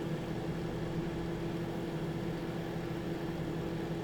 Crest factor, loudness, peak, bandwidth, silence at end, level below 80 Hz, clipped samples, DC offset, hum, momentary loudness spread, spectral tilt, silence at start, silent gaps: 12 dB; -38 LUFS; -26 dBFS; 18 kHz; 0 s; -52 dBFS; under 0.1%; under 0.1%; none; 1 LU; -7 dB/octave; 0 s; none